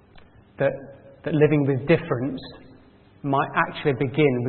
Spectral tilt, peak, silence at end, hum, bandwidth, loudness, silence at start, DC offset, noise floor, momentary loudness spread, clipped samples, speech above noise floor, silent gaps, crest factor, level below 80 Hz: -12 dB/octave; -4 dBFS; 0 s; none; 4.4 kHz; -23 LUFS; 0.6 s; under 0.1%; -52 dBFS; 16 LU; under 0.1%; 30 dB; none; 20 dB; -56 dBFS